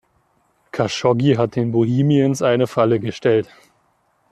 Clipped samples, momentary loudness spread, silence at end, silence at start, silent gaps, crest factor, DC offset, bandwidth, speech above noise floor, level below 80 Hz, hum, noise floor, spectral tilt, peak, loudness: under 0.1%; 6 LU; 0.85 s; 0.75 s; none; 16 dB; under 0.1%; 13 kHz; 46 dB; -58 dBFS; none; -63 dBFS; -7 dB/octave; -4 dBFS; -18 LUFS